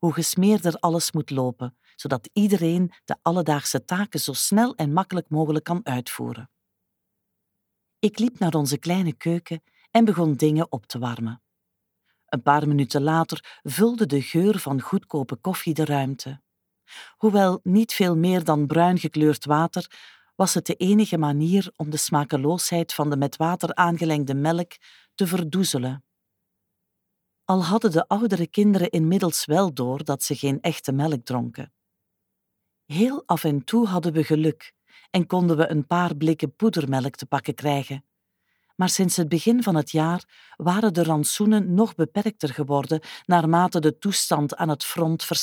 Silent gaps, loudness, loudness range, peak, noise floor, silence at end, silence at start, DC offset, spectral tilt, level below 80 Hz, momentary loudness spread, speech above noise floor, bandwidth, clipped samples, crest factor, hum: none; -23 LUFS; 5 LU; -4 dBFS; -79 dBFS; 0 s; 0 s; under 0.1%; -5.5 dB/octave; -72 dBFS; 9 LU; 57 dB; 20 kHz; under 0.1%; 20 dB; none